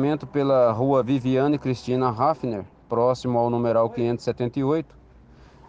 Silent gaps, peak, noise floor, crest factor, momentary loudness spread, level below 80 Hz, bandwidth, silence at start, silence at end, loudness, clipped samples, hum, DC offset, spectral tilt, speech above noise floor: none; -8 dBFS; -50 dBFS; 16 dB; 8 LU; -54 dBFS; 8 kHz; 0 s; 0.85 s; -23 LUFS; under 0.1%; none; under 0.1%; -8 dB/octave; 28 dB